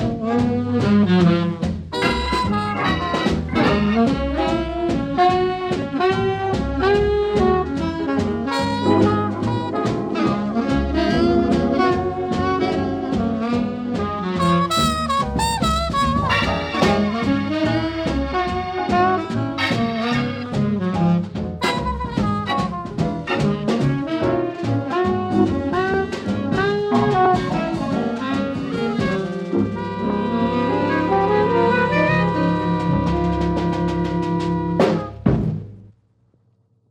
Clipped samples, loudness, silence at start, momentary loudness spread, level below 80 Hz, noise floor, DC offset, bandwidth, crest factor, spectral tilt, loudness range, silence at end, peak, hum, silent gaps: under 0.1%; -20 LUFS; 0 s; 6 LU; -36 dBFS; -61 dBFS; under 0.1%; 16 kHz; 16 dB; -6.5 dB/octave; 3 LU; 1.05 s; -4 dBFS; none; none